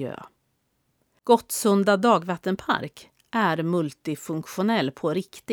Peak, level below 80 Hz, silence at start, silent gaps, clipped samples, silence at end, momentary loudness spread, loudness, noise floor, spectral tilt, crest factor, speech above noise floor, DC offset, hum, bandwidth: -4 dBFS; -66 dBFS; 0 s; none; under 0.1%; 0 s; 12 LU; -24 LUFS; -72 dBFS; -5 dB/octave; 20 dB; 48 dB; under 0.1%; none; over 20 kHz